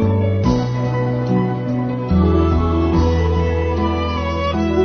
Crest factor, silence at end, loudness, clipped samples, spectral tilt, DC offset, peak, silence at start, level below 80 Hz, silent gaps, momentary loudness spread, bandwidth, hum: 14 dB; 0 s; -18 LUFS; under 0.1%; -8.5 dB/octave; 0.3%; -2 dBFS; 0 s; -26 dBFS; none; 4 LU; 6.6 kHz; none